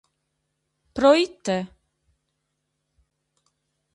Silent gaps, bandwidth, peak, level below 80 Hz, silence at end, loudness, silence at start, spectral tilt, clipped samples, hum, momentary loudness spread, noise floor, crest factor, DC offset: none; 11 kHz; -4 dBFS; -60 dBFS; 2.3 s; -21 LUFS; 0.95 s; -5 dB/octave; under 0.1%; none; 19 LU; -77 dBFS; 22 dB; under 0.1%